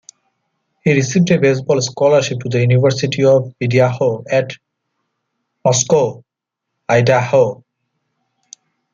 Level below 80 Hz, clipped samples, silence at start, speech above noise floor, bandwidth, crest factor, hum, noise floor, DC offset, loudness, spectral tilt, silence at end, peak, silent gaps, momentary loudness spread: -58 dBFS; under 0.1%; 0.85 s; 66 dB; 7.6 kHz; 14 dB; none; -80 dBFS; under 0.1%; -15 LUFS; -5.5 dB/octave; 1.4 s; -2 dBFS; none; 7 LU